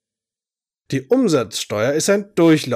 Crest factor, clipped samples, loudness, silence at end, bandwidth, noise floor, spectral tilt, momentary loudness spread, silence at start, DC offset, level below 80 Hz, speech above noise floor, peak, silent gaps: 14 dB; under 0.1%; -18 LUFS; 0 s; 16 kHz; under -90 dBFS; -5 dB/octave; 9 LU; 0.9 s; under 0.1%; -66 dBFS; over 73 dB; -6 dBFS; none